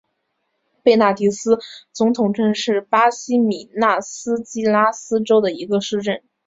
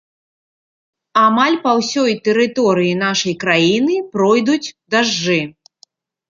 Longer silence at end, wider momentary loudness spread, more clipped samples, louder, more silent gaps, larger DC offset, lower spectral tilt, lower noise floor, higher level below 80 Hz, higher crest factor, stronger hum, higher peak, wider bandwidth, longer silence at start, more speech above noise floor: second, 0.3 s vs 0.8 s; about the same, 7 LU vs 5 LU; neither; second, -18 LUFS vs -15 LUFS; neither; neither; about the same, -4.5 dB/octave vs -4.5 dB/octave; first, -72 dBFS vs -53 dBFS; about the same, -64 dBFS vs -60 dBFS; about the same, 16 dB vs 16 dB; neither; about the same, -2 dBFS vs 0 dBFS; about the same, 7.8 kHz vs 7.6 kHz; second, 0.85 s vs 1.15 s; first, 54 dB vs 38 dB